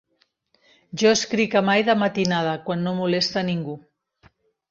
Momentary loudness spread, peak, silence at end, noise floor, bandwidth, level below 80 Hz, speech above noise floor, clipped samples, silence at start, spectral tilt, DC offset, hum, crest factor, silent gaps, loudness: 10 LU; -4 dBFS; 0.9 s; -68 dBFS; 7.6 kHz; -64 dBFS; 47 dB; under 0.1%; 0.95 s; -4.5 dB/octave; under 0.1%; none; 18 dB; none; -21 LUFS